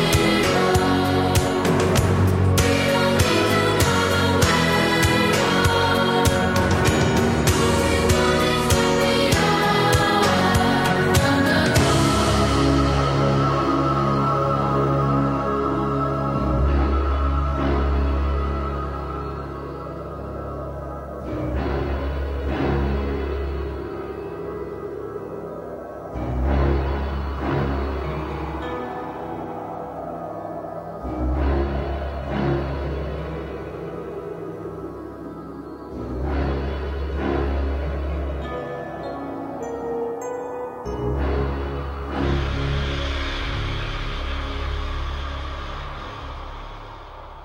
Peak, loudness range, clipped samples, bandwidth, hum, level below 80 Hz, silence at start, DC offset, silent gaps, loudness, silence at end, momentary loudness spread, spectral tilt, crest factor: -4 dBFS; 11 LU; under 0.1%; 16 kHz; none; -30 dBFS; 0 s; under 0.1%; none; -22 LUFS; 0 s; 14 LU; -5 dB/octave; 18 dB